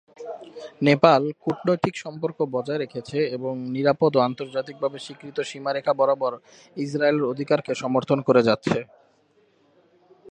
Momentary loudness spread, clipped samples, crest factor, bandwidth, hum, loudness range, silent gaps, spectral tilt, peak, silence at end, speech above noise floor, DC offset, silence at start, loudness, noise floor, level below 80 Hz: 14 LU; under 0.1%; 24 dB; 9.8 kHz; none; 2 LU; none; -6.5 dB/octave; 0 dBFS; 0.05 s; 39 dB; under 0.1%; 0.2 s; -23 LUFS; -62 dBFS; -66 dBFS